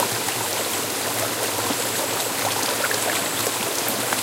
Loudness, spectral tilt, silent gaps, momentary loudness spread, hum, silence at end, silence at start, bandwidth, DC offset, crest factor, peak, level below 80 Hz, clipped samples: -22 LUFS; -1.5 dB/octave; none; 2 LU; none; 0 s; 0 s; 17 kHz; under 0.1%; 20 dB; -4 dBFS; -62 dBFS; under 0.1%